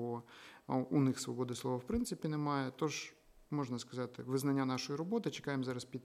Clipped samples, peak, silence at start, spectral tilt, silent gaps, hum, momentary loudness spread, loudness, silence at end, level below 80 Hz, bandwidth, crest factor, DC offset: under 0.1%; -22 dBFS; 0 s; -5.5 dB/octave; none; none; 9 LU; -38 LUFS; 0.05 s; -62 dBFS; 15.5 kHz; 16 dB; under 0.1%